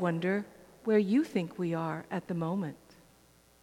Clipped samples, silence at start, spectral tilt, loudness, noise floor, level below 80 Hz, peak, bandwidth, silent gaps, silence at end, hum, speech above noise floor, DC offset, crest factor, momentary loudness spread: under 0.1%; 0 s; -8 dB/octave; -32 LUFS; -62 dBFS; -72 dBFS; -14 dBFS; 15.5 kHz; none; 0.85 s; none; 32 dB; under 0.1%; 18 dB; 11 LU